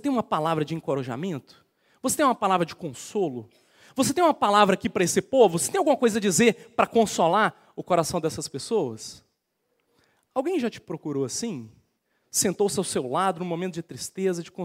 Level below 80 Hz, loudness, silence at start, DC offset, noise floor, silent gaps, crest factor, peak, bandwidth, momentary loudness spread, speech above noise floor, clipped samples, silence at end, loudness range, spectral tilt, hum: -64 dBFS; -24 LUFS; 0.05 s; under 0.1%; -75 dBFS; none; 22 dB; -4 dBFS; 16 kHz; 13 LU; 51 dB; under 0.1%; 0 s; 9 LU; -4 dB/octave; none